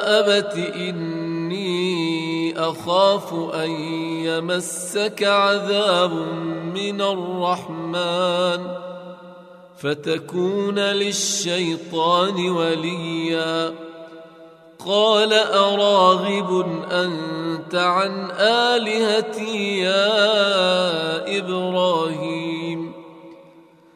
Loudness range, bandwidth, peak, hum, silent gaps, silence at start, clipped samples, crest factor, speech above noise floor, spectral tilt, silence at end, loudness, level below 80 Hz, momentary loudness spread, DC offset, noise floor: 5 LU; 15 kHz; -2 dBFS; none; none; 0 s; under 0.1%; 20 dB; 29 dB; -4 dB/octave; 0.55 s; -20 LUFS; -72 dBFS; 10 LU; under 0.1%; -49 dBFS